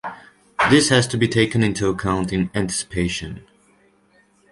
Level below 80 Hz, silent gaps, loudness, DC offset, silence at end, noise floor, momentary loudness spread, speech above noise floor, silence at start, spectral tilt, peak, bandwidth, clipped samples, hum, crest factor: -42 dBFS; none; -19 LUFS; under 0.1%; 1.1 s; -58 dBFS; 18 LU; 39 dB; 0.05 s; -4.5 dB/octave; -2 dBFS; 11.5 kHz; under 0.1%; none; 20 dB